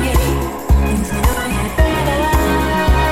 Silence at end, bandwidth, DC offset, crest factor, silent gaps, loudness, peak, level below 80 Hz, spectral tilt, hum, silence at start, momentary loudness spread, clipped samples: 0 s; 16.5 kHz; under 0.1%; 12 dB; none; -16 LUFS; -2 dBFS; -18 dBFS; -5.5 dB/octave; none; 0 s; 4 LU; under 0.1%